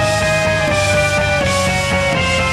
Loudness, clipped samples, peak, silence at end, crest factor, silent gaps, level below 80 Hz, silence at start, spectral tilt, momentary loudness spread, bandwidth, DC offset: -14 LUFS; under 0.1%; -4 dBFS; 0 s; 10 dB; none; -30 dBFS; 0 s; -4 dB/octave; 1 LU; 15 kHz; under 0.1%